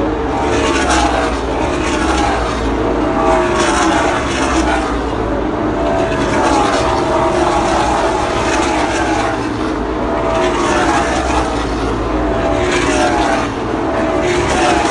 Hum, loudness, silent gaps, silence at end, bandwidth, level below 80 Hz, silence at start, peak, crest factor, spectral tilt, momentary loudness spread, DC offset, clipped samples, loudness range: none; -15 LUFS; none; 0 s; 11.5 kHz; -26 dBFS; 0 s; 0 dBFS; 14 dB; -4.5 dB/octave; 5 LU; under 0.1%; under 0.1%; 1 LU